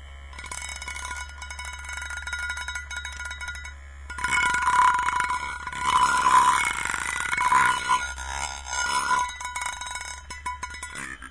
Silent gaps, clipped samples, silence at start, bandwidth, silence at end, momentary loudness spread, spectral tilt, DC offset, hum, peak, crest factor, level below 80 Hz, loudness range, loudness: none; under 0.1%; 0 s; 11 kHz; 0 s; 15 LU; -1 dB/octave; 0.2%; none; -6 dBFS; 20 dB; -44 dBFS; 11 LU; -25 LUFS